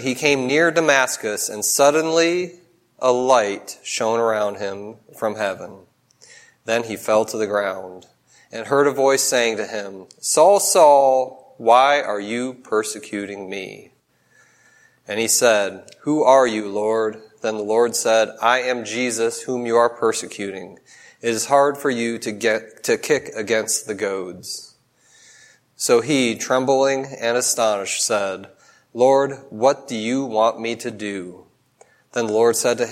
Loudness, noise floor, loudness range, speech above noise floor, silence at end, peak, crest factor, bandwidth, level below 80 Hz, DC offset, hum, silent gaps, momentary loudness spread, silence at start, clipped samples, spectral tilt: -19 LUFS; -58 dBFS; 8 LU; 39 dB; 0 s; 0 dBFS; 20 dB; 16 kHz; -70 dBFS; under 0.1%; none; none; 15 LU; 0 s; under 0.1%; -2.5 dB/octave